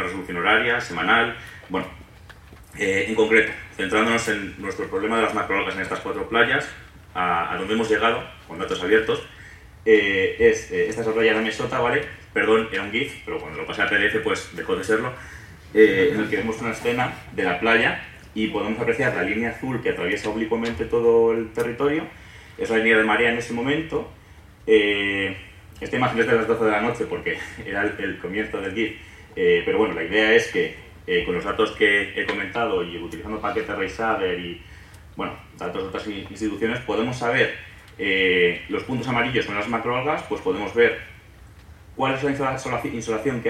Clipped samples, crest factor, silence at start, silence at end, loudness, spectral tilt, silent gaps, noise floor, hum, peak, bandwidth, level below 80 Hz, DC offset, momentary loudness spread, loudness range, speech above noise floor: under 0.1%; 22 dB; 0 s; 0 s; -22 LUFS; -5 dB/octave; none; -47 dBFS; none; -2 dBFS; 13.5 kHz; -50 dBFS; under 0.1%; 13 LU; 4 LU; 24 dB